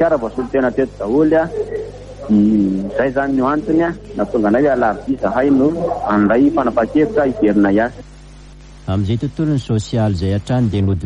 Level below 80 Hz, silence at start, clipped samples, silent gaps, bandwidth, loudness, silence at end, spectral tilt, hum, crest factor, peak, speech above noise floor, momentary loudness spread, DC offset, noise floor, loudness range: -38 dBFS; 0 s; under 0.1%; none; 9.8 kHz; -16 LUFS; 0 s; -8 dB/octave; 50 Hz at -35 dBFS; 12 dB; -2 dBFS; 22 dB; 7 LU; under 0.1%; -37 dBFS; 3 LU